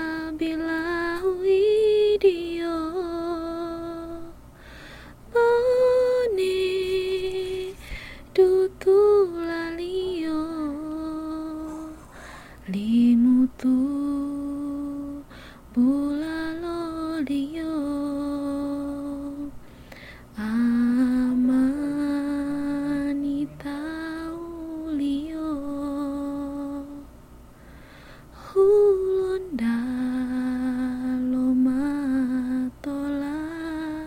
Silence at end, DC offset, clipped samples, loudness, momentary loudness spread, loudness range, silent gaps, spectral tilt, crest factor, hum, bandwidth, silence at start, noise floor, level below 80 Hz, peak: 0 s; under 0.1%; under 0.1%; -25 LUFS; 16 LU; 7 LU; none; -6.5 dB/octave; 16 dB; none; 15.5 kHz; 0 s; -47 dBFS; -48 dBFS; -8 dBFS